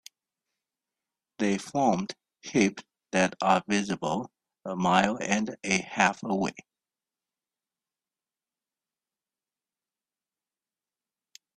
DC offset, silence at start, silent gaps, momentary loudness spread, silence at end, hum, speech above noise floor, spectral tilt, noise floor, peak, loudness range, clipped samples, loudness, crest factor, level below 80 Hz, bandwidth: under 0.1%; 1.4 s; none; 12 LU; 4.95 s; none; over 63 dB; -4.5 dB/octave; under -90 dBFS; -6 dBFS; 5 LU; under 0.1%; -27 LUFS; 24 dB; -66 dBFS; 11.5 kHz